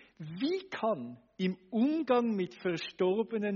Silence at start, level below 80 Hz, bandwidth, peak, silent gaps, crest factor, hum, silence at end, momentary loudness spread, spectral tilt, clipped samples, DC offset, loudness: 0.2 s; -78 dBFS; 7 kHz; -16 dBFS; none; 16 dB; none; 0 s; 7 LU; -5 dB/octave; under 0.1%; under 0.1%; -33 LUFS